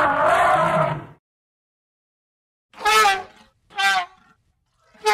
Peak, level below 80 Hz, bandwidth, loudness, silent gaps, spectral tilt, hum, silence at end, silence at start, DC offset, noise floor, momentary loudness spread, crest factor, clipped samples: -6 dBFS; -54 dBFS; 16 kHz; -19 LUFS; 1.19-2.69 s; -3 dB/octave; none; 0 s; 0 s; under 0.1%; -66 dBFS; 14 LU; 16 dB; under 0.1%